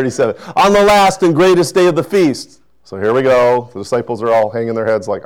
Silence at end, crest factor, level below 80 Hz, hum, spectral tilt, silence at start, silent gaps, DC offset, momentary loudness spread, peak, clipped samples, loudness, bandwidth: 0.05 s; 8 dB; -44 dBFS; none; -5 dB/octave; 0 s; none; 0.4%; 9 LU; -6 dBFS; under 0.1%; -13 LUFS; 18.5 kHz